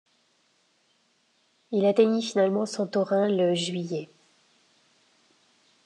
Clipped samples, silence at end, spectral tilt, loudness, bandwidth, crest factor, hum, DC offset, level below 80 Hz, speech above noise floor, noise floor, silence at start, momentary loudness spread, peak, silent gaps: under 0.1%; 1.8 s; -5.5 dB/octave; -25 LUFS; 10.5 kHz; 20 dB; none; under 0.1%; -88 dBFS; 44 dB; -68 dBFS; 1.7 s; 11 LU; -8 dBFS; none